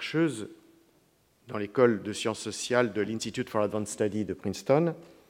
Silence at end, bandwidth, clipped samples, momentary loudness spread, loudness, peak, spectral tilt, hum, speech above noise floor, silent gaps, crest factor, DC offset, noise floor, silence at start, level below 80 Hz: 0.2 s; 16.5 kHz; under 0.1%; 9 LU; -29 LUFS; -8 dBFS; -5 dB/octave; none; 37 dB; none; 22 dB; under 0.1%; -66 dBFS; 0 s; -70 dBFS